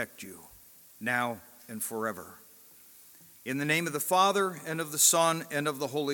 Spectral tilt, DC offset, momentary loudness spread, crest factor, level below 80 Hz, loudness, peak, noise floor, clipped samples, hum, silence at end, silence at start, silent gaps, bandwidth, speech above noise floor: -2.5 dB/octave; under 0.1%; 22 LU; 24 dB; -76 dBFS; -28 LUFS; -6 dBFS; -55 dBFS; under 0.1%; none; 0 s; 0 s; none; 17.5 kHz; 26 dB